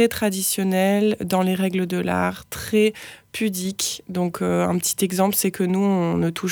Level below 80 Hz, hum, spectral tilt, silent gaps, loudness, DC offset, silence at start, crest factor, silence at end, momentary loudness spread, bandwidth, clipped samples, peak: -54 dBFS; none; -4.5 dB/octave; none; -22 LUFS; under 0.1%; 0 s; 16 dB; 0 s; 6 LU; over 20 kHz; under 0.1%; -6 dBFS